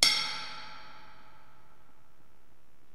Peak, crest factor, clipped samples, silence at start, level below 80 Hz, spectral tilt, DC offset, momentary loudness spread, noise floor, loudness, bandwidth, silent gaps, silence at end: -4 dBFS; 32 dB; under 0.1%; 0 s; -68 dBFS; 1 dB/octave; 0.9%; 26 LU; -66 dBFS; -30 LUFS; 16 kHz; none; 1.95 s